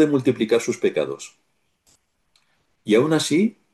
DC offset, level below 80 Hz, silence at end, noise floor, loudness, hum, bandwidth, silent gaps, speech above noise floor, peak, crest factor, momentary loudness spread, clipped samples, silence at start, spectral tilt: under 0.1%; -68 dBFS; 0.25 s; -66 dBFS; -21 LUFS; none; 12.5 kHz; none; 46 dB; -6 dBFS; 16 dB; 16 LU; under 0.1%; 0 s; -5 dB/octave